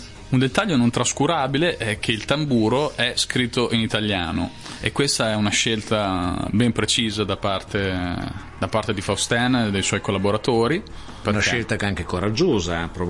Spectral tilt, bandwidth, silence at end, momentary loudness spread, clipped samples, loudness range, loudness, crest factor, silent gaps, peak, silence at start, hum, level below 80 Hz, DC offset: -4.5 dB/octave; 11.5 kHz; 0 s; 6 LU; under 0.1%; 2 LU; -21 LUFS; 18 dB; none; -4 dBFS; 0 s; none; -44 dBFS; 0.1%